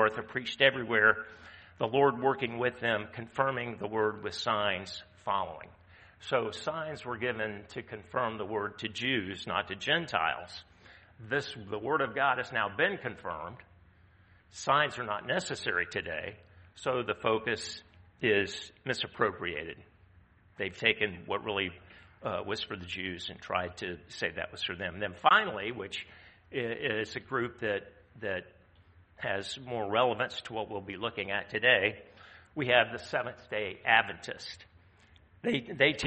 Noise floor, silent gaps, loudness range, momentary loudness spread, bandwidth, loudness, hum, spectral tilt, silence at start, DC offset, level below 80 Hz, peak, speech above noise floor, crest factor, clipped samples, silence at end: -61 dBFS; none; 6 LU; 15 LU; 8.4 kHz; -32 LUFS; none; -4 dB/octave; 0 s; under 0.1%; -66 dBFS; -8 dBFS; 29 dB; 26 dB; under 0.1%; 0 s